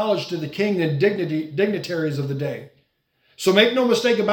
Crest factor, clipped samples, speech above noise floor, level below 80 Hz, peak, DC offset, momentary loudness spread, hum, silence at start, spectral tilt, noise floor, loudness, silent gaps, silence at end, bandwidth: 20 dB; under 0.1%; 46 dB; -66 dBFS; -2 dBFS; under 0.1%; 11 LU; none; 0 s; -5.5 dB/octave; -66 dBFS; -21 LUFS; none; 0 s; 18 kHz